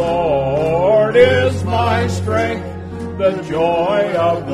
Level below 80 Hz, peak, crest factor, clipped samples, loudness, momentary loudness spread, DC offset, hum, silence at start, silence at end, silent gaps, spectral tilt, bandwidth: -40 dBFS; 0 dBFS; 16 dB; under 0.1%; -15 LUFS; 10 LU; under 0.1%; none; 0 s; 0 s; none; -6.5 dB/octave; 12 kHz